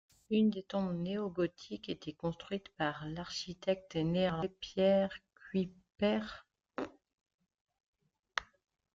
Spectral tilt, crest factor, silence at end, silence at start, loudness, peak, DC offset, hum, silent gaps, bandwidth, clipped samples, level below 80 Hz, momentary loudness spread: -6.5 dB/octave; 22 dB; 0.5 s; 0.3 s; -36 LUFS; -14 dBFS; under 0.1%; none; 7.14-7.18 s, 7.34-7.39 s, 7.61-7.65 s, 7.86-7.93 s; 7.6 kHz; under 0.1%; -66 dBFS; 13 LU